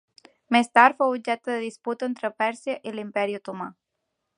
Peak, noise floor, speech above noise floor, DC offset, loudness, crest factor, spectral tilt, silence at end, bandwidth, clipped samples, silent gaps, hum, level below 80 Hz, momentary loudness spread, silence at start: -2 dBFS; -80 dBFS; 56 dB; under 0.1%; -24 LUFS; 24 dB; -4 dB/octave; 0.65 s; 11 kHz; under 0.1%; none; none; -78 dBFS; 15 LU; 0.5 s